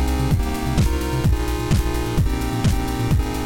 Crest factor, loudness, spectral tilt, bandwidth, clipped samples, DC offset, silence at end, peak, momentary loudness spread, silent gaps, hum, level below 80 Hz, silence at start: 14 dB; -21 LUFS; -6 dB/octave; 17 kHz; under 0.1%; under 0.1%; 0 s; -6 dBFS; 2 LU; none; none; -24 dBFS; 0 s